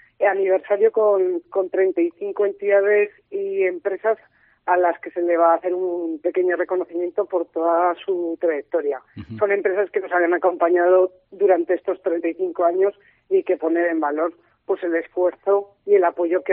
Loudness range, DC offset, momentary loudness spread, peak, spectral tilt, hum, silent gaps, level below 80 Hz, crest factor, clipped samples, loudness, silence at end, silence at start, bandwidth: 3 LU; under 0.1%; 7 LU; -4 dBFS; -4.5 dB/octave; none; none; -68 dBFS; 16 dB; under 0.1%; -21 LUFS; 0 s; 0.2 s; 3.7 kHz